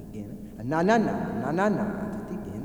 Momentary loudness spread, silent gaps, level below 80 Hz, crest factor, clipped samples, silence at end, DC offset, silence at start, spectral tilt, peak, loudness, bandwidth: 16 LU; none; -52 dBFS; 20 dB; under 0.1%; 0 s; 0.1%; 0 s; -7 dB/octave; -8 dBFS; -27 LUFS; over 20 kHz